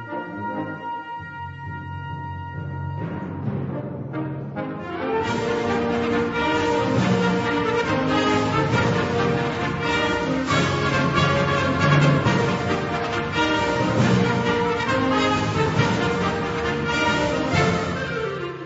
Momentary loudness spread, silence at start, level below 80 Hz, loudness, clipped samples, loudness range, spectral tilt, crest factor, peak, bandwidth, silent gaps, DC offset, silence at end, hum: 11 LU; 0 s; -44 dBFS; -22 LUFS; under 0.1%; 10 LU; -6 dB/octave; 18 dB; -4 dBFS; 8 kHz; none; under 0.1%; 0 s; none